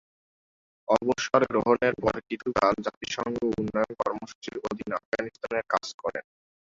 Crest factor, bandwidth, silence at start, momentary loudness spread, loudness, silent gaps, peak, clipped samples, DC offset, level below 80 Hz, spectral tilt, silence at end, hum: 22 dB; 7.8 kHz; 0.9 s; 11 LU; -28 LUFS; 2.97-3.01 s, 4.35-4.42 s, 5.05-5.12 s, 5.94-5.99 s; -6 dBFS; under 0.1%; under 0.1%; -58 dBFS; -5 dB/octave; 0.55 s; none